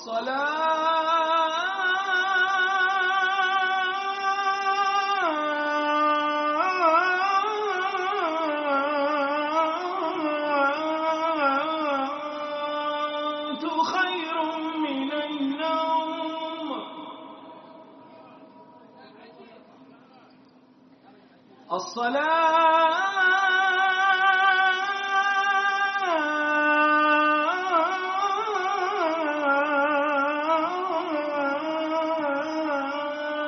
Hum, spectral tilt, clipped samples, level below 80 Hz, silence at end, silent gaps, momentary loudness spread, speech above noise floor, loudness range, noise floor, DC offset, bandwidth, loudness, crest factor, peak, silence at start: none; 1 dB/octave; under 0.1%; -80 dBFS; 0 s; none; 9 LU; 31 dB; 8 LU; -55 dBFS; under 0.1%; 6.4 kHz; -24 LUFS; 16 dB; -10 dBFS; 0 s